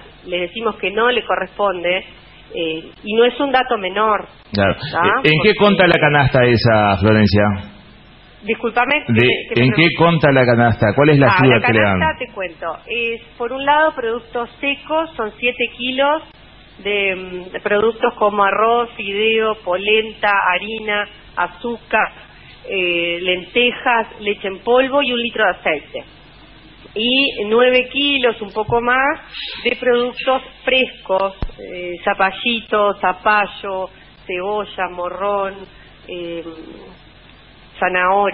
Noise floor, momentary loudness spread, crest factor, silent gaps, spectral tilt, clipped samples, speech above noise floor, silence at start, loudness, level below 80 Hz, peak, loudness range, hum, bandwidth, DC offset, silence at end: -44 dBFS; 13 LU; 18 dB; none; -8.5 dB/octave; under 0.1%; 27 dB; 0.05 s; -16 LUFS; -44 dBFS; 0 dBFS; 7 LU; none; 5.8 kHz; 0.1%; 0 s